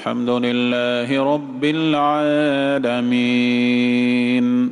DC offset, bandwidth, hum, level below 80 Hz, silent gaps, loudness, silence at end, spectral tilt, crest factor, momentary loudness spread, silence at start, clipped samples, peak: under 0.1%; 10.5 kHz; none; -64 dBFS; none; -18 LUFS; 0 s; -6 dB/octave; 10 dB; 3 LU; 0 s; under 0.1%; -8 dBFS